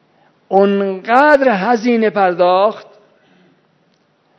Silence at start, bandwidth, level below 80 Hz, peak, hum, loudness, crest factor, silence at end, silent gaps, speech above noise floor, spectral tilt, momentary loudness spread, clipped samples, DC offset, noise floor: 0.5 s; 7.8 kHz; -60 dBFS; 0 dBFS; none; -13 LUFS; 16 dB; 1.55 s; none; 45 dB; -6.5 dB/octave; 7 LU; 0.1%; under 0.1%; -58 dBFS